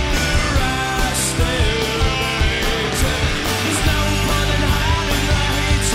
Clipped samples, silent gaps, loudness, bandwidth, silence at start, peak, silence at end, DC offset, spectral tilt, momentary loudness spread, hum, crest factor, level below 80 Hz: under 0.1%; none; -18 LUFS; 16 kHz; 0 s; -6 dBFS; 0 s; under 0.1%; -3.5 dB/octave; 1 LU; none; 12 dB; -22 dBFS